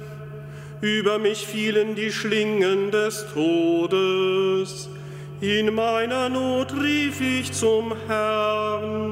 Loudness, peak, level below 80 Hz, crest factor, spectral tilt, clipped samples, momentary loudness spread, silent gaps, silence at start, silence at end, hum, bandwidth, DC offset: -23 LUFS; -8 dBFS; -62 dBFS; 14 dB; -4.5 dB/octave; under 0.1%; 11 LU; none; 0 s; 0 s; none; 16 kHz; under 0.1%